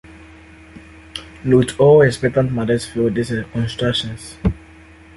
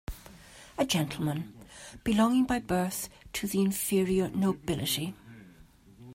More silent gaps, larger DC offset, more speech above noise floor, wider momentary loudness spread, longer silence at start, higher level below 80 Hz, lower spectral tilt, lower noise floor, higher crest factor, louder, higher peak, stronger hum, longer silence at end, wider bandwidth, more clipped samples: neither; neither; about the same, 27 dB vs 27 dB; second, 18 LU vs 21 LU; about the same, 0.1 s vs 0.1 s; first, -38 dBFS vs -52 dBFS; about the same, -6 dB/octave vs -5 dB/octave; second, -43 dBFS vs -56 dBFS; about the same, 16 dB vs 18 dB; first, -17 LUFS vs -29 LUFS; first, -2 dBFS vs -12 dBFS; neither; first, 0.6 s vs 0 s; second, 11.5 kHz vs 16 kHz; neither